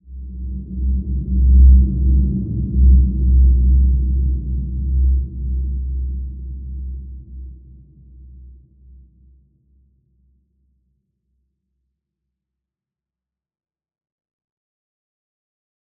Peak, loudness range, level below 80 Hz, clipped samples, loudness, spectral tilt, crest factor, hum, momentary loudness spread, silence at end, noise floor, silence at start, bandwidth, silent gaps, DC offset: -2 dBFS; 20 LU; -18 dBFS; under 0.1%; -17 LUFS; -18.5 dB/octave; 18 dB; none; 18 LU; 7.5 s; -89 dBFS; 0.1 s; 0.6 kHz; none; under 0.1%